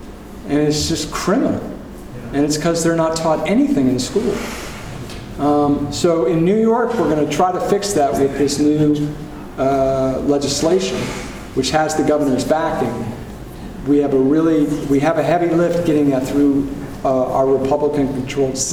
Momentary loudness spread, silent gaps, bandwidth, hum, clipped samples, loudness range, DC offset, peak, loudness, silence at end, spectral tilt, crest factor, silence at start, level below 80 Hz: 13 LU; none; 16 kHz; none; under 0.1%; 2 LU; under 0.1%; -2 dBFS; -17 LUFS; 0 s; -5.5 dB/octave; 16 dB; 0 s; -38 dBFS